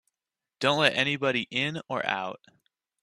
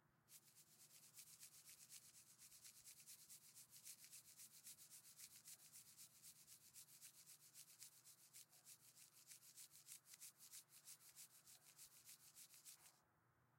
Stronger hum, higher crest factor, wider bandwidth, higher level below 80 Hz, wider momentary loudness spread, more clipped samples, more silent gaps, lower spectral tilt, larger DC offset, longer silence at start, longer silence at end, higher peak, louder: neither; about the same, 24 dB vs 28 dB; second, 13.5 kHz vs 16.5 kHz; first, -70 dBFS vs under -90 dBFS; first, 8 LU vs 5 LU; neither; neither; first, -4 dB/octave vs 0.5 dB/octave; neither; first, 0.6 s vs 0 s; first, 0.65 s vs 0 s; first, -6 dBFS vs -38 dBFS; first, -26 LUFS vs -63 LUFS